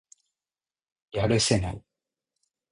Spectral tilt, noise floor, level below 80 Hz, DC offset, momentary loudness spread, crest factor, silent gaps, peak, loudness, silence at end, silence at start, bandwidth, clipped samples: -4.5 dB/octave; under -90 dBFS; -48 dBFS; under 0.1%; 14 LU; 22 dB; none; -8 dBFS; -26 LUFS; 0.9 s; 1.15 s; 11 kHz; under 0.1%